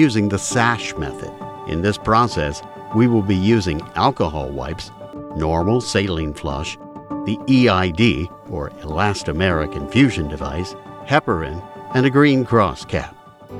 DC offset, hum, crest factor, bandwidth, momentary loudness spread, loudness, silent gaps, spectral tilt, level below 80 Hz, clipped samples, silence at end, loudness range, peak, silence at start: under 0.1%; none; 18 dB; 13 kHz; 15 LU; -19 LUFS; none; -6 dB/octave; -38 dBFS; under 0.1%; 0 s; 3 LU; 0 dBFS; 0 s